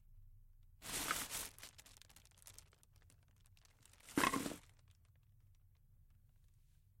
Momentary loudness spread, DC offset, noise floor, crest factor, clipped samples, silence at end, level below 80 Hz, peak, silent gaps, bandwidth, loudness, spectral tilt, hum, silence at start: 25 LU; under 0.1%; -69 dBFS; 30 dB; under 0.1%; 2.1 s; -66 dBFS; -18 dBFS; none; 16.5 kHz; -41 LUFS; -2.5 dB/octave; none; 0.1 s